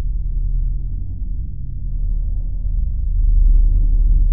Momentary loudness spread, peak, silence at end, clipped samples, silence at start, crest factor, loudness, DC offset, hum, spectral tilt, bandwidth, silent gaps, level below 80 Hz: 11 LU; -4 dBFS; 0 s; under 0.1%; 0 s; 10 dB; -23 LUFS; 4%; none; -14 dB/octave; 0.6 kHz; none; -16 dBFS